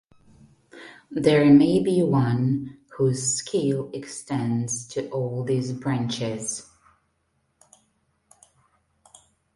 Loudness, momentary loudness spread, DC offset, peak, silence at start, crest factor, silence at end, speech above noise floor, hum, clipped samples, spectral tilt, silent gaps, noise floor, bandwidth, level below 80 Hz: -23 LUFS; 17 LU; under 0.1%; -4 dBFS; 0.75 s; 20 dB; 2.95 s; 49 dB; none; under 0.1%; -5.5 dB/octave; none; -71 dBFS; 11.5 kHz; -60 dBFS